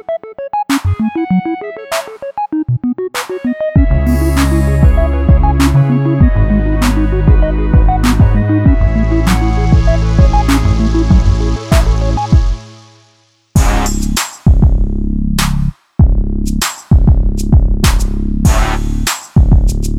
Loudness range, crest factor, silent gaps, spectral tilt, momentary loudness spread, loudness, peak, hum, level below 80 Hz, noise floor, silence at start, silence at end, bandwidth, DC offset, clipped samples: 4 LU; 10 dB; none; -6 dB/octave; 8 LU; -13 LUFS; 0 dBFS; none; -14 dBFS; -52 dBFS; 0.1 s; 0 s; 15.5 kHz; under 0.1%; under 0.1%